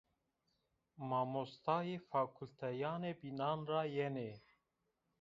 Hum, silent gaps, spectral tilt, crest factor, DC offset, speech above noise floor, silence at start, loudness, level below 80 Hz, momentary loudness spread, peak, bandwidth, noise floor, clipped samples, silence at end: none; none; -5.5 dB/octave; 20 dB; under 0.1%; 45 dB; 1 s; -41 LUFS; -80 dBFS; 8 LU; -22 dBFS; 7.4 kHz; -86 dBFS; under 0.1%; 0.8 s